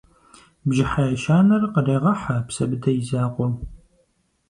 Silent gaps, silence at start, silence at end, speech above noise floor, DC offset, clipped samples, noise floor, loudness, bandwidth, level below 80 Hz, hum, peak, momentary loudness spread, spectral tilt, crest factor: none; 0.65 s; 0.75 s; 46 dB; under 0.1%; under 0.1%; -66 dBFS; -21 LUFS; 11 kHz; -44 dBFS; none; -6 dBFS; 9 LU; -7 dB/octave; 16 dB